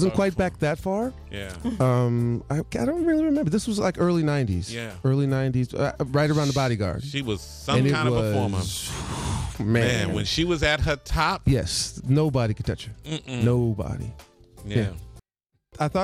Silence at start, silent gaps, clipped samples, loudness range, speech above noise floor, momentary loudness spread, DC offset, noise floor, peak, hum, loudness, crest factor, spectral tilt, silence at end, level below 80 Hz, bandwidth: 0 s; none; under 0.1%; 3 LU; 52 dB; 9 LU; under 0.1%; -76 dBFS; -8 dBFS; none; -25 LUFS; 16 dB; -6 dB/octave; 0 s; -40 dBFS; 14.5 kHz